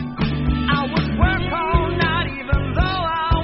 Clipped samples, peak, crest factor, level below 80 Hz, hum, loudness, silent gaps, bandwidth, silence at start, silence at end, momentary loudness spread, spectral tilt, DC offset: under 0.1%; -2 dBFS; 16 dB; -26 dBFS; none; -20 LUFS; none; 5.8 kHz; 0 s; 0 s; 3 LU; -4.5 dB/octave; 0.2%